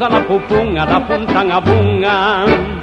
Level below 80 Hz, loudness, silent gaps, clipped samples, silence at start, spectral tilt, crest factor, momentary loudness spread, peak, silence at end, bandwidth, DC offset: -32 dBFS; -13 LUFS; none; under 0.1%; 0 s; -7.5 dB/octave; 14 dB; 2 LU; 0 dBFS; 0 s; 7.8 kHz; under 0.1%